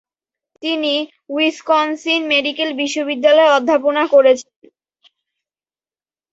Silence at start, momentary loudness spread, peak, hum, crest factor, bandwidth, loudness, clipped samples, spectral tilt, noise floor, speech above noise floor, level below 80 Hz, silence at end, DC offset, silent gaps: 0.65 s; 8 LU; -2 dBFS; none; 16 dB; 8 kHz; -15 LUFS; under 0.1%; -1.5 dB/octave; under -90 dBFS; over 75 dB; -68 dBFS; 1.9 s; under 0.1%; none